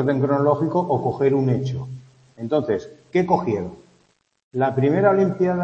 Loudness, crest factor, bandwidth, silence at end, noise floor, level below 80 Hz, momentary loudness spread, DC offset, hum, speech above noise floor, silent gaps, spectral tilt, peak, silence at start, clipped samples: -21 LUFS; 18 dB; 7.4 kHz; 0 s; -63 dBFS; -58 dBFS; 14 LU; under 0.1%; none; 43 dB; 4.43-4.51 s; -9 dB/octave; -4 dBFS; 0 s; under 0.1%